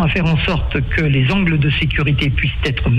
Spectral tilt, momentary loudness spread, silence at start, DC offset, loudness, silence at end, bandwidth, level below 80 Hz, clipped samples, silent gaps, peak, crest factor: -7.5 dB/octave; 4 LU; 0 s; under 0.1%; -16 LUFS; 0 s; 8 kHz; -24 dBFS; under 0.1%; none; -6 dBFS; 8 dB